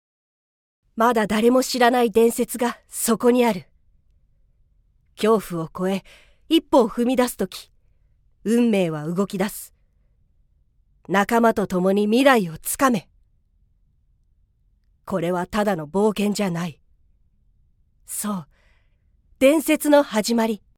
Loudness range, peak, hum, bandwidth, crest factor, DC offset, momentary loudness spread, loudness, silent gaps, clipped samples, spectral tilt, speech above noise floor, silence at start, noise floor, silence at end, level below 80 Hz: 6 LU; -2 dBFS; none; 19 kHz; 20 dB; under 0.1%; 12 LU; -21 LUFS; none; under 0.1%; -4.5 dB/octave; 42 dB; 0.95 s; -62 dBFS; 0.2 s; -54 dBFS